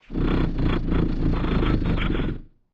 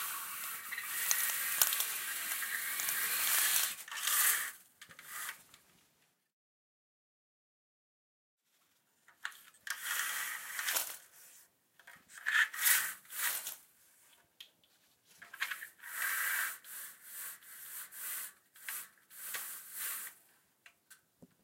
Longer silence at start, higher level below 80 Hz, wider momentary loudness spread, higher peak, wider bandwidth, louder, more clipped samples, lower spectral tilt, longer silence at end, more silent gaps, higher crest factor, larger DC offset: about the same, 0.1 s vs 0 s; first, -26 dBFS vs under -90 dBFS; second, 4 LU vs 18 LU; about the same, -8 dBFS vs -8 dBFS; second, 5.4 kHz vs 16.5 kHz; first, -25 LUFS vs -34 LUFS; neither; first, -9 dB/octave vs 3.5 dB/octave; about the same, 0.3 s vs 0.2 s; second, none vs 6.33-8.38 s; second, 14 dB vs 32 dB; neither